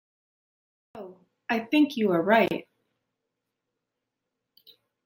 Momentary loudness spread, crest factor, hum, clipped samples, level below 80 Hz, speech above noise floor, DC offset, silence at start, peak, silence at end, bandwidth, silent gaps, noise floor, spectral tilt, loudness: 23 LU; 22 dB; none; under 0.1%; -74 dBFS; 61 dB; under 0.1%; 0.95 s; -8 dBFS; 2.45 s; 16.5 kHz; none; -84 dBFS; -6.5 dB/octave; -24 LUFS